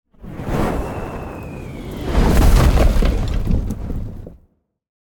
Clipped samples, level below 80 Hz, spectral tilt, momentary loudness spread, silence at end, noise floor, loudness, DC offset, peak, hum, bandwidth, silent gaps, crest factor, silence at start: under 0.1%; -20 dBFS; -6.5 dB/octave; 17 LU; 0.7 s; -58 dBFS; -20 LUFS; under 0.1%; -2 dBFS; none; 18 kHz; none; 16 dB; 0.2 s